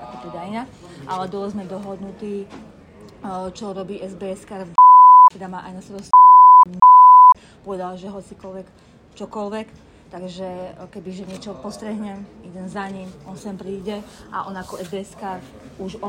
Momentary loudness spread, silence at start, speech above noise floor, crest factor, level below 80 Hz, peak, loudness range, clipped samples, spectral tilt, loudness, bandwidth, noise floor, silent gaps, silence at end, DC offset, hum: 27 LU; 0.4 s; 15 dB; 14 dB; -56 dBFS; -4 dBFS; 23 LU; under 0.1%; -6 dB/octave; -9 LUFS; 9.4 kHz; -44 dBFS; none; 0 s; under 0.1%; none